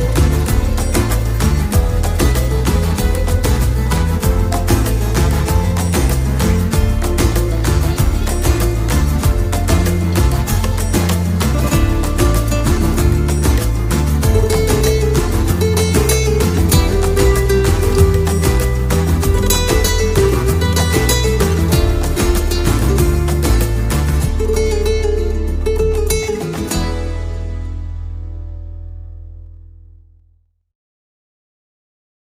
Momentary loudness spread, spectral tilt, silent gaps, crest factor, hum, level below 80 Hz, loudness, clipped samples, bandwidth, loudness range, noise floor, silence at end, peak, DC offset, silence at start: 6 LU; -5.5 dB/octave; none; 14 dB; none; -18 dBFS; -15 LUFS; under 0.1%; 16 kHz; 6 LU; -55 dBFS; 2.55 s; 0 dBFS; under 0.1%; 0 s